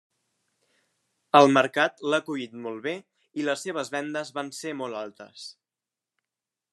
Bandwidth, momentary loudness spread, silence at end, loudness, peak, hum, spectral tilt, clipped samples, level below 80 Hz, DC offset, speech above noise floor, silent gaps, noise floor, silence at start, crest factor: 12.5 kHz; 21 LU; 1.2 s; -25 LUFS; -2 dBFS; none; -4.5 dB/octave; under 0.1%; -80 dBFS; under 0.1%; 64 dB; none; -90 dBFS; 1.35 s; 26 dB